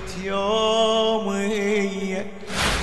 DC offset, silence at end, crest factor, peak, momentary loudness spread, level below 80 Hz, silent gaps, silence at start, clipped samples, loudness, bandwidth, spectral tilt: 1%; 0 s; 16 dB; -8 dBFS; 9 LU; -40 dBFS; none; 0 s; under 0.1%; -22 LUFS; 12 kHz; -4 dB/octave